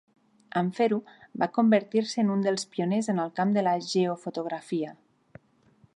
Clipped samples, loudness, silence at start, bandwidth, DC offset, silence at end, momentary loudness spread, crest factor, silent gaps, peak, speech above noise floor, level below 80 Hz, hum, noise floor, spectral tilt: under 0.1%; -27 LUFS; 0.55 s; 11 kHz; under 0.1%; 1.05 s; 10 LU; 18 dB; none; -10 dBFS; 35 dB; -78 dBFS; none; -62 dBFS; -6 dB/octave